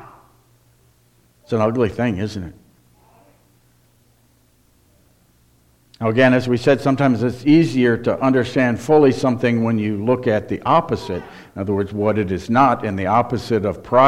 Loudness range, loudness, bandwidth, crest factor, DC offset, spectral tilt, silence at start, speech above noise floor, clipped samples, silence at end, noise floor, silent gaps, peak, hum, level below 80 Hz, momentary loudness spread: 9 LU; -18 LUFS; 13 kHz; 18 dB; under 0.1%; -7.5 dB/octave; 0 s; 40 dB; under 0.1%; 0 s; -57 dBFS; none; 0 dBFS; none; -50 dBFS; 10 LU